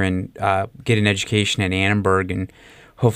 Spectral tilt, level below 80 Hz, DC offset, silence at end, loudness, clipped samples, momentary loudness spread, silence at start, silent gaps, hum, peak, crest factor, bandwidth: -5 dB/octave; -50 dBFS; under 0.1%; 0 s; -20 LUFS; under 0.1%; 7 LU; 0 s; none; none; -4 dBFS; 16 dB; 15 kHz